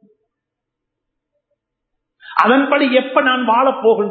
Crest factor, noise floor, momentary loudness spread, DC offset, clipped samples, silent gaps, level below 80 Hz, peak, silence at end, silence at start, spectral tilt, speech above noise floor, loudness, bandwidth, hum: 18 dB; -80 dBFS; 3 LU; under 0.1%; under 0.1%; none; -74 dBFS; 0 dBFS; 0 s; 2.3 s; -6.5 dB/octave; 66 dB; -14 LUFS; 6.8 kHz; none